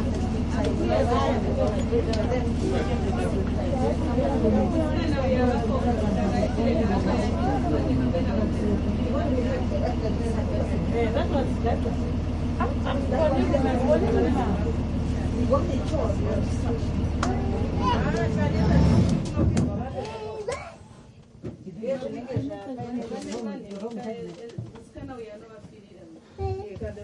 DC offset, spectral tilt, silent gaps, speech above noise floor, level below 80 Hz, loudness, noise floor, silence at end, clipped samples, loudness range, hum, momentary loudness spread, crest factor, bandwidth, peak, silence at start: under 0.1%; -7.5 dB/octave; none; 25 dB; -34 dBFS; -25 LUFS; -48 dBFS; 0 s; under 0.1%; 10 LU; none; 12 LU; 16 dB; 11 kHz; -8 dBFS; 0 s